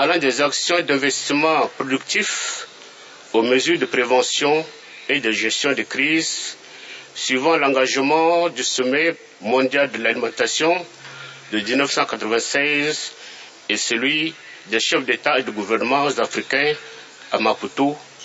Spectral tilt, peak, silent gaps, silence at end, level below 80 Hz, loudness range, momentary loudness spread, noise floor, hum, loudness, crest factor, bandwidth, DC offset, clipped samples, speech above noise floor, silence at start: -2 dB/octave; -2 dBFS; none; 0 s; -74 dBFS; 2 LU; 15 LU; -42 dBFS; none; -19 LUFS; 18 dB; 8.2 kHz; under 0.1%; under 0.1%; 22 dB; 0 s